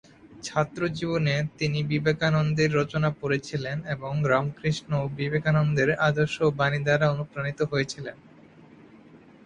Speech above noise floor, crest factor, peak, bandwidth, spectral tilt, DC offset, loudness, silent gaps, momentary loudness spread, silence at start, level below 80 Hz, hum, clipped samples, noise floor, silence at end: 26 dB; 18 dB; -8 dBFS; 9.4 kHz; -6.5 dB/octave; under 0.1%; -26 LUFS; none; 8 LU; 0.25 s; -54 dBFS; none; under 0.1%; -51 dBFS; 0.3 s